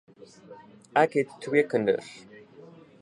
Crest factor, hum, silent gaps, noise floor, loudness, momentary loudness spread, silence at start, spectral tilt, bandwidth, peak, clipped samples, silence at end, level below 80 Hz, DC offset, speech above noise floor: 22 dB; none; none; -50 dBFS; -26 LUFS; 14 LU; 0.5 s; -6 dB/octave; 11 kHz; -6 dBFS; under 0.1%; 0.85 s; -74 dBFS; under 0.1%; 24 dB